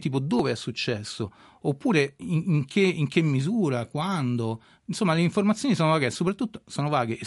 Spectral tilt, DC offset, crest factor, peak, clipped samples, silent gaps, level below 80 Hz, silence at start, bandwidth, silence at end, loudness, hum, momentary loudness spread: -6 dB/octave; under 0.1%; 18 dB; -8 dBFS; under 0.1%; none; -64 dBFS; 0 s; 11.5 kHz; 0 s; -26 LUFS; none; 9 LU